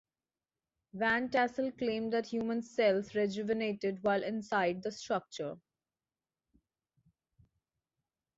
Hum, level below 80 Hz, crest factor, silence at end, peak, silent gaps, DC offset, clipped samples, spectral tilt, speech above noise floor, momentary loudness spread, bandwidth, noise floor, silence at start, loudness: none; -74 dBFS; 18 dB; 2.8 s; -18 dBFS; none; under 0.1%; under 0.1%; -3.5 dB/octave; over 57 dB; 10 LU; 7.8 kHz; under -90 dBFS; 0.95 s; -34 LUFS